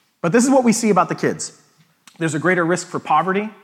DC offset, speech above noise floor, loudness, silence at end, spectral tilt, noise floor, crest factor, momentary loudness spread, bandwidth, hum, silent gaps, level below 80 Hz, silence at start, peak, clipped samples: under 0.1%; 35 dB; -18 LUFS; 0.1 s; -5 dB/octave; -52 dBFS; 16 dB; 9 LU; 15.5 kHz; none; none; -72 dBFS; 0.25 s; -2 dBFS; under 0.1%